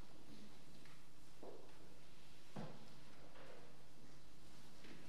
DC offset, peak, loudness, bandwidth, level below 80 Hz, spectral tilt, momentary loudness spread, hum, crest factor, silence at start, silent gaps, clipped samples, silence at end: 0.6%; -36 dBFS; -61 LUFS; 15 kHz; -74 dBFS; -5 dB/octave; 9 LU; none; 22 dB; 0 s; none; under 0.1%; 0 s